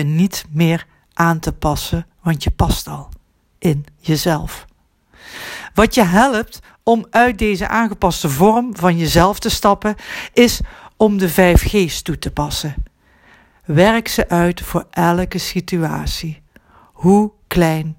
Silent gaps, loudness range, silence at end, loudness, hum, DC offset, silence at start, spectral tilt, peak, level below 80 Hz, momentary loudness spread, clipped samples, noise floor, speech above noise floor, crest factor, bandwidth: none; 5 LU; 0.05 s; -16 LUFS; none; under 0.1%; 0 s; -5.5 dB/octave; 0 dBFS; -30 dBFS; 13 LU; under 0.1%; -53 dBFS; 38 dB; 16 dB; 17 kHz